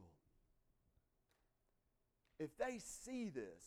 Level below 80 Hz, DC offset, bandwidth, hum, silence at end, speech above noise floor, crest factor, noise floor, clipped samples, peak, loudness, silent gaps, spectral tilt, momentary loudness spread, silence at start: -76 dBFS; under 0.1%; 17 kHz; none; 0 s; 36 dB; 22 dB; -84 dBFS; under 0.1%; -30 dBFS; -48 LUFS; none; -4.5 dB/octave; 6 LU; 0 s